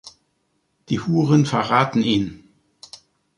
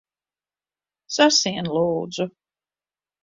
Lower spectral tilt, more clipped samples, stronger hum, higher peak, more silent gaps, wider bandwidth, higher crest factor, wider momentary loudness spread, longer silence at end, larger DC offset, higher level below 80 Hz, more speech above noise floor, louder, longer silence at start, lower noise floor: first, -6.5 dB/octave vs -3 dB/octave; neither; second, none vs 50 Hz at -60 dBFS; about the same, -2 dBFS vs -4 dBFS; neither; first, 11 kHz vs 7.8 kHz; about the same, 20 dB vs 22 dB; first, 24 LU vs 13 LU; about the same, 1 s vs 0.95 s; neither; first, -54 dBFS vs -64 dBFS; second, 51 dB vs over 69 dB; about the same, -19 LUFS vs -21 LUFS; second, 0.05 s vs 1.1 s; second, -69 dBFS vs under -90 dBFS